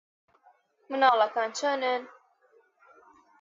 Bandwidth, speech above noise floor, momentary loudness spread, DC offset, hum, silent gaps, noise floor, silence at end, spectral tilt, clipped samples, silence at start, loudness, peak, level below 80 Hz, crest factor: 7.8 kHz; 39 dB; 10 LU; under 0.1%; none; none; -65 dBFS; 1.35 s; -1 dB/octave; under 0.1%; 0.9 s; -26 LUFS; -8 dBFS; -86 dBFS; 22 dB